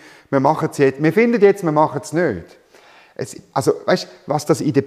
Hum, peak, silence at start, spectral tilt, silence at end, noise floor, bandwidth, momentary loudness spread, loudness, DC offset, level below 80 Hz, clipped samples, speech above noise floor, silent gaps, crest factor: none; -2 dBFS; 0.3 s; -6 dB/octave; 0 s; -48 dBFS; 14.5 kHz; 16 LU; -18 LUFS; under 0.1%; -60 dBFS; under 0.1%; 31 dB; none; 16 dB